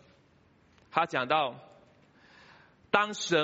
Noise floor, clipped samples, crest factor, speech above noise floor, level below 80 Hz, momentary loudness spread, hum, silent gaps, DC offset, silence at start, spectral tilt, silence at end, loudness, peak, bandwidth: -64 dBFS; under 0.1%; 26 dB; 36 dB; -74 dBFS; 7 LU; none; none; under 0.1%; 0.95 s; -1.5 dB/octave; 0 s; -29 LUFS; -6 dBFS; 8 kHz